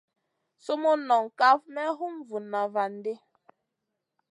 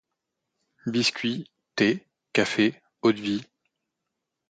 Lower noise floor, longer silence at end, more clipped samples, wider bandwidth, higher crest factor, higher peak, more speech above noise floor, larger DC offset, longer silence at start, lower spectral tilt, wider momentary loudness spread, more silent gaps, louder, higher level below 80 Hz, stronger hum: about the same, -83 dBFS vs -83 dBFS; about the same, 1.15 s vs 1.05 s; neither; first, 11 kHz vs 9.2 kHz; about the same, 20 dB vs 22 dB; about the same, -8 dBFS vs -6 dBFS; about the same, 57 dB vs 59 dB; neither; second, 0.65 s vs 0.85 s; about the same, -4.5 dB/octave vs -4.5 dB/octave; first, 15 LU vs 10 LU; neither; about the same, -27 LUFS vs -26 LUFS; second, under -90 dBFS vs -68 dBFS; neither